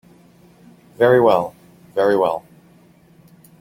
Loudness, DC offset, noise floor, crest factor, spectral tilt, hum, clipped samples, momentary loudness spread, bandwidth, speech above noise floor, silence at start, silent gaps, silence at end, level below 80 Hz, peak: -17 LUFS; under 0.1%; -51 dBFS; 18 dB; -7 dB/octave; none; under 0.1%; 15 LU; 16.5 kHz; 35 dB; 1 s; none; 1.2 s; -60 dBFS; -2 dBFS